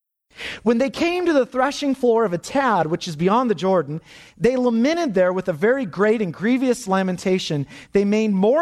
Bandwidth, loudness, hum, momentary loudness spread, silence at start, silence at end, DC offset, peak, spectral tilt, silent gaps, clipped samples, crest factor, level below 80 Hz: 13.5 kHz; -20 LUFS; none; 5 LU; 0.4 s; 0 s; under 0.1%; -6 dBFS; -6 dB/octave; none; under 0.1%; 14 dB; -56 dBFS